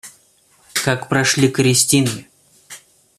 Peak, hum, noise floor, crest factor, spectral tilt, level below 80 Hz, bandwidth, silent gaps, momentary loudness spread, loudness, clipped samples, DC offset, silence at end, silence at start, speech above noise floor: 0 dBFS; none; -55 dBFS; 18 dB; -3.5 dB/octave; -54 dBFS; 15 kHz; none; 10 LU; -16 LUFS; under 0.1%; under 0.1%; 0.4 s; 0.05 s; 39 dB